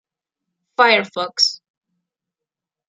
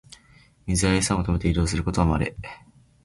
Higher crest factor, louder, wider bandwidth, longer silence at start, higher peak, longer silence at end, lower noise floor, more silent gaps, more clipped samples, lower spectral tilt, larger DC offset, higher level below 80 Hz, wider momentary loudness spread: first, 22 dB vs 16 dB; first, -16 LUFS vs -23 LUFS; about the same, 11 kHz vs 11.5 kHz; first, 0.8 s vs 0.65 s; first, -2 dBFS vs -8 dBFS; first, 1.35 s vs 0.5 s; first, -86 dBFS vs -55 dBFS; neither; neither; second, -1 dB/octave vs -5 dB/octave; neither; second, -76 dBFS vs -34 dBFS; about the same, 15 LU vs 17 LU